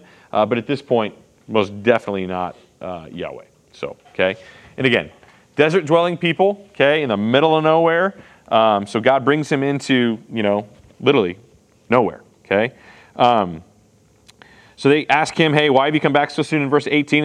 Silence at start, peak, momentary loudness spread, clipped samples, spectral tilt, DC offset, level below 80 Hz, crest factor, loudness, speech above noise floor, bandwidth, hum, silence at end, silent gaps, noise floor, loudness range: 0.35 s; 0 dBFS; 16 LU; under 0.1%; -6 dB/octave; under 0.1%; -62 dBFS; 18 dB; -18 LUFS; 37 dB; 10.5 kHz; none; 0 s; none; -54 dBFS; 6 LU